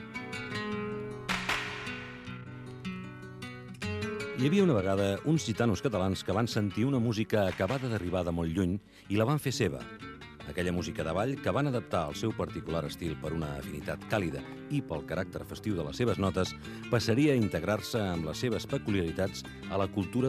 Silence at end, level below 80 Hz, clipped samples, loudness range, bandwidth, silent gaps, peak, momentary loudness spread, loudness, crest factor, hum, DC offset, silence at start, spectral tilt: 0 s; -56 dBFS; under 0.1%; 6 LU; 15 kHz; none; -14 dBFS; 12 LU; -32 LUFS; 18 dB; none; under 0.1%; 0 s; -6 dB/octave